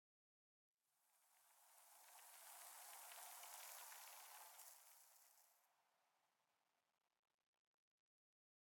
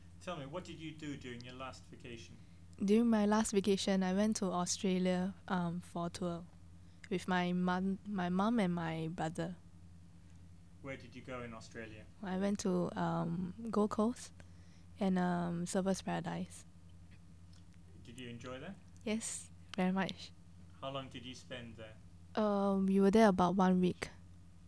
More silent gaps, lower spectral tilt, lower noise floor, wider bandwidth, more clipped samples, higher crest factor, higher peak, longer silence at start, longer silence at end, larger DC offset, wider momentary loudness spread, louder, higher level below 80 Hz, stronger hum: neither; second, 4 dB/octave vs -6 dB/octave; first, -90 dBFS vs -58 dBFS; first, 19 kHz vs 11 kHz; neither; about the same, 26 dB vs 22 dB; second, -40 dBFS vs -16 dBFS; first, 0.95 s vs 0 s; first, 2.45 s vs 0 s; neither; second, 11 LU vs 19 LU; second, -59 LUFS vs -36 LUFS; second, under -90 dBFS vs -66 dBFS; neither